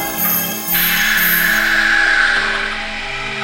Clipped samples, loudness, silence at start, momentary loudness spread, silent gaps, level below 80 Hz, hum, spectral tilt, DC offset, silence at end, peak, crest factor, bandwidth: under 0.1%; -14 LUFS; 0 s; 10 LU; none; -34 dBFS; none; -1 dB/octave; 0.2%; 0 s; -2 dBFS; 14 dB; 16 kHz